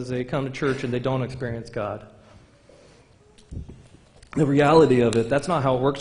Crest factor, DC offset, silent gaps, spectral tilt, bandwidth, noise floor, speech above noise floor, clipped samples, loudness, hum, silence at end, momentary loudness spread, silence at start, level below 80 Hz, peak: 20 dB; under 0.1%; none; -7 dB/octave; 10.5 kHz; -54 dBFS; 32 dB; under 0.1%; -22 LUFS; none; 0 s; 21 LU; 0 s; -50 dBFS; -4 dBFS